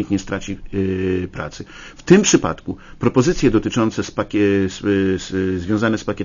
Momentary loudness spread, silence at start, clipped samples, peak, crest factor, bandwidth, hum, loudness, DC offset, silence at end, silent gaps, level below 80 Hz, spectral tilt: 15 LU; 0 s; under 0.1%; 0 dBFS; 18 dB; 7.4 kHz; none; -18 LUFS; under 0.1%; 0 s; none; -38 dBFS; -5 dB/octave